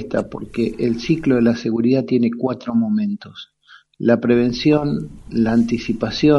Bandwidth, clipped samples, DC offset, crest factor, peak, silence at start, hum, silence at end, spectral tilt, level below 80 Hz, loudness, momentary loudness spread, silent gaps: 7 kHz; under 0.1%; under 0.1%; 16 dB; -2 dBFS; 0 s; none; 0 s; -7 dB/octave; -46 dBFS; -19 LUFS; 9 LU; none